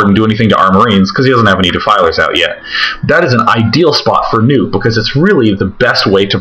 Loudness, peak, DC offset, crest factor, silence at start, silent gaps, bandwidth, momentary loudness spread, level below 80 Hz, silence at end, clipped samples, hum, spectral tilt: -9 LUFS; 0 dBFS; under 0.1%; 8 dB; 0 s; none; 8.8 kHz; 4 LU; -36 dBFS; 0 s; 0.3%; none; -6 dB/octave